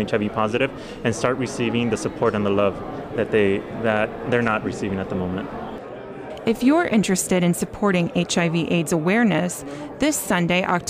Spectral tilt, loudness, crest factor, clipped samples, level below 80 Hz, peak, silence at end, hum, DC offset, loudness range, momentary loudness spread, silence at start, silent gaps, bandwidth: -5 dB/octave; -22 LUFS; 14 dB; under 0.1%; -48 dBFS; -6 dBFS; 0 s; none; under 0.1%; 3 LU; 11 LU; 0 s; none; 15.5 kHz